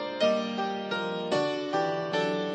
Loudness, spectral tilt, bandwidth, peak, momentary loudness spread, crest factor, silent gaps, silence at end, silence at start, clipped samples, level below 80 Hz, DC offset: -29 LUFS; -5 dB/octave; 9 kHz; -14 dBFS; 5 LU; 16 dB; none; 0 s; 0 s; under 0.1%; -76 dBFS; under 0.1%